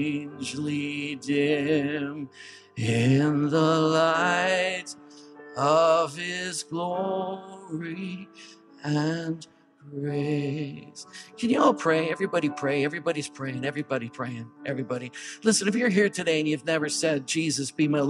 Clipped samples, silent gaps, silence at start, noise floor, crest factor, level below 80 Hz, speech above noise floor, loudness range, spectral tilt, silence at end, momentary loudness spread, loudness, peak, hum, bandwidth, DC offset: under 0.1%; none; 0 s; -47 dBFS; 18 dB; -74 dBFS; 21 dB; 8 LU; -5 dB/octave; 0 s; 16 LU; -26 LUFS; -8 dBFS; none; 12.5 kHz; under 0.1%